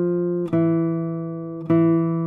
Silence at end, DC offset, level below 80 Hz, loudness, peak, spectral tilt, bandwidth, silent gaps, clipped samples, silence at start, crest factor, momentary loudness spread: 0 s; under 0.1%; -62 dBFS; -22 LUFS; -8 dBFS; -12 dB/octave; 3.5 kHz; none; under 0.1%; 0 s; 12 dB; 11 LU